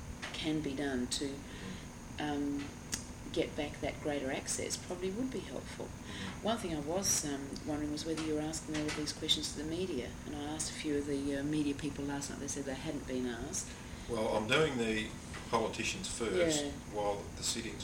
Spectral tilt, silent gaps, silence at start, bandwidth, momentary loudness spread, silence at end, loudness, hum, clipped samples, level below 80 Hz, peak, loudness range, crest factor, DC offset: -3.5 dB/octave; none; 0 s; 17 kHz; 10 LU; 0 s; -37 LUFS; none; under 0.1%; -54 dBFS; -16 dBFS; 4 LU; 20 dB; under 0.1%